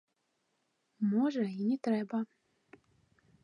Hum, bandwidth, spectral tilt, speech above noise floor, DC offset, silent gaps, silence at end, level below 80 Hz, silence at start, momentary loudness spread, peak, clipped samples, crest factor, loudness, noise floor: none; 9.6 kHz; -8 dB/octave; 48 dB; under 0.1%; none; 1.2 s; -86 dBFS; 1 s; 7 LU; -20 dBFS; under 0.1%; 16 dB; -33 LUFS; -80 dBFS